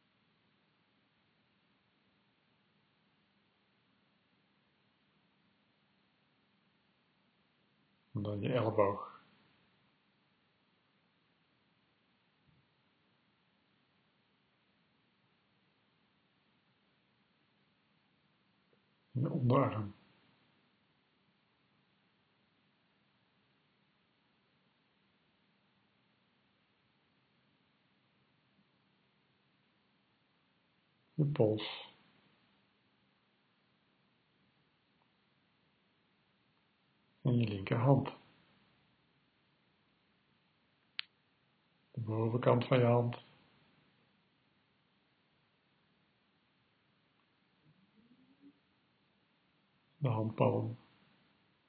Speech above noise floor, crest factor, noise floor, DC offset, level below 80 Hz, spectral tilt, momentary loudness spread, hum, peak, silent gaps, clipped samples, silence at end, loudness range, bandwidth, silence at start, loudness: 43 dB; 28 dB; -75 dBFS; under 0.1%; -80 dBFS; -7 dB/octave; 17 LU; none; -16 dBFS; none; under 0.1%; 0.95 s; 15 LU; 4.6 kHz; 8.15 s; -34 LUFS